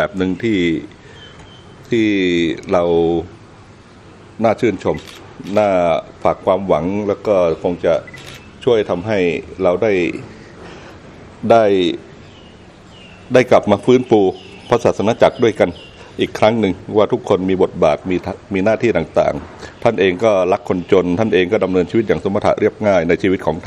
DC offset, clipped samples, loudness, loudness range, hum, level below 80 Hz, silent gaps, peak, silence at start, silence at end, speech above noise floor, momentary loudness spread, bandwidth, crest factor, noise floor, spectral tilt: under 0.1%; under 0.1%; -16 LUFS; 4 LU; none; -46 dBFS; none; 0 dBFS; 0 s; 0 s; 26 dB; 14 LU; 11 kHz; 16 dB; -41 dBFS; -6.5 dB/octave